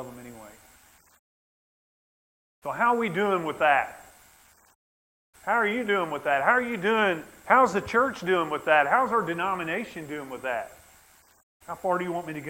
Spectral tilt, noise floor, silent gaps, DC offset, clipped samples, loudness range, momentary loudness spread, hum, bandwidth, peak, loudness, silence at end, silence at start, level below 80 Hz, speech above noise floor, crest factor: -5 dB/octave; -58 dBFS; 1.19-2.62 s, 4.75-5.33 s, 11.43-11.60 s; under 0.1%; under 0.1%; 7 LU; 16 LU; none; 16.5 kHz; -4 dBFS; -25 LUFS; 0 s; 0 s; -64 dBFS; 33 dB; 24 dB